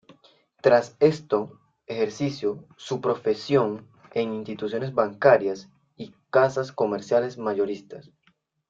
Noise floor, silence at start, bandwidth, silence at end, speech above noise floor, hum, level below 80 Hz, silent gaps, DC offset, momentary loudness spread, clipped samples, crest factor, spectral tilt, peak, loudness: -67 dBFS; 0.65 s; 7.6 kHz; 0.7 s; 43 dB; none; -68 dBFS; none; under 0.1%; 17 LU; under 0.1%; 20 dB; -6.5 dB/octave; -4 dBFS; -24 LUFS